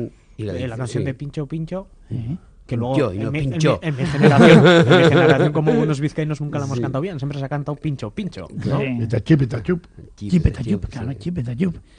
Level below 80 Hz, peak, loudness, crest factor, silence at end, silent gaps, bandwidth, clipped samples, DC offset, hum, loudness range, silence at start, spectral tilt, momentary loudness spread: -40 dBFS; 0 dBFS; -18 LUFS; 18 dB; 0.2 s; none; 10 kHz; under 0.1%; under 0.1%; none; 10 LU; 0 s; -7 dB/octave; 17 LU